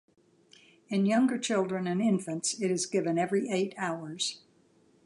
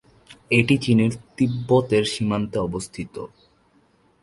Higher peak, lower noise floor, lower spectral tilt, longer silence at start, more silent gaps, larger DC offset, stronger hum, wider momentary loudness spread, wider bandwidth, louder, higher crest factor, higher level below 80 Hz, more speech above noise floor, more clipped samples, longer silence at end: second, -14 dBFS vs 0 dBFS; first, -64 dBFS vs -60 dBFS; second, -4.5 dB/octave vs -6 dB/octave; first, 0.9 s vs 0.3 s; neither; neither; neither; second, 7 LU vs 15 LU; about the same, 11.5 kHz vs 11.5 kHz; second, -30 LUFS vs -21 LUFS; second, 16 dB vs 22 dB; second, -80 dBFS vs -52 dBFS; second, 35 dB vs 39 dB; neither; second, 0.7 s vs 0.95 s